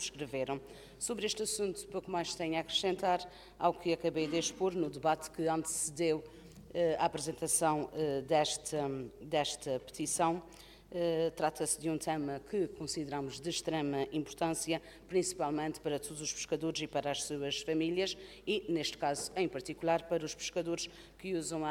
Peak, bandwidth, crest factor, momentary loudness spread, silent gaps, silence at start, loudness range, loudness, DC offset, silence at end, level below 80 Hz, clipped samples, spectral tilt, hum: -16 dBFS; 16.5 kHz; 20 dB; 7 LU; none; 0 s; 3 LU; -35 LUFS; under 0.1%; 0 s; -64 dBFS; under 0.1%; -3.5 dB/octave; none